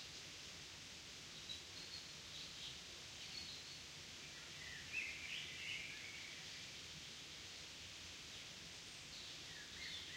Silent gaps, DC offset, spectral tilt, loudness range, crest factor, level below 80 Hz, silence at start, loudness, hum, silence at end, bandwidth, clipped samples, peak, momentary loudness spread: none; under 0.1%; -1 dB/octave; 3 LU; 18 dB; -74 dBFS; 0 s; -50 LUFS; none; 0 s; 16 kHz; under 0.1%; -34 dBFS; 6 LU